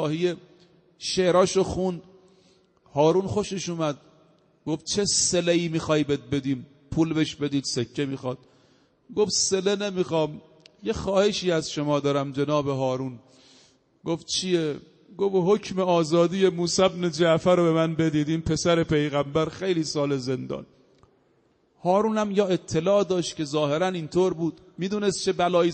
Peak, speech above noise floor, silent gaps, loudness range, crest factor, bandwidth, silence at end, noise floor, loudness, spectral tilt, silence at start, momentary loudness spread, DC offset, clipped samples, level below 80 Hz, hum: -6 dBFS; 41 dB; none; 5 LU; 18 dB; 8.4 kHz; 0 s; -65 dBFS; -24 LUFS; -4.5 dB/octave; 0 s; 11 LU; under 0.1%; under 0.1%; -54 dBFS; none